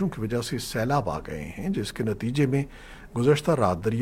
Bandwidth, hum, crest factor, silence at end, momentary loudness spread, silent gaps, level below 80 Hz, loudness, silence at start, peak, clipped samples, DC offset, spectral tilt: 16.5 kHz; none; 18 dB; 0 s; 12 LU; none; -46 dBFS; -26 LUFS; 0 s; -8 dBFS; under 0.1%; under 0.1%; -6.5 dB/octave